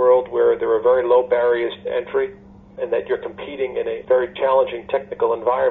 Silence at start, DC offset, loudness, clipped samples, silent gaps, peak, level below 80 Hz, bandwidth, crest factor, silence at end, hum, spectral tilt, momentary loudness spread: 0 s; under 0.1%; -20 LUFS; under 0.1%; none; -4 dBFS; -54 dBFS; 4 kHz; 14 dB; 0 s; none; -3 dB/octave; 9 LU